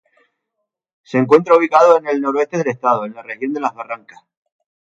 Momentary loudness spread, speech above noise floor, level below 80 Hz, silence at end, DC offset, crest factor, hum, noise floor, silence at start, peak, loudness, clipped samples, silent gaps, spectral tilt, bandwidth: 17 LU; 61 dB; -68 dBFS; 1 s; under 0.1%; 16 dB; none; -77 dBFS; 1.1 s; 0 dBFS; -15 LUFS; under 0.1%; none; -6.5 dB/octave; 7.6 kHz